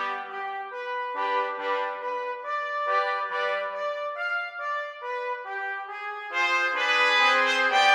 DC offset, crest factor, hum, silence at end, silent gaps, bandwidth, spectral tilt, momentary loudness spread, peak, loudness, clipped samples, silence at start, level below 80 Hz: under 0.1%; 18 dB; none; 0 s; none; 16 kHz; 1 dB/octave; 13 LU; -8 dBFS; -26 LUFS; under 0.1%; 0 s; -86 dBFS